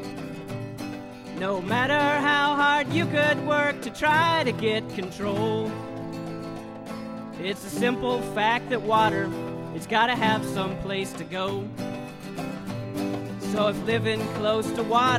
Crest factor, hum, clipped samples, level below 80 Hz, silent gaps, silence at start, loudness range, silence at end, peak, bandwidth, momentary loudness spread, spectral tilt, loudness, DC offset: 18 dB; none; under 0.1%; -56 dBFS; none; 0 s; 7 LU; 0 s; -8 dBFS; 16 kHz; 14 LU; -5 dB/octave; -25 LUFS; under 0.1%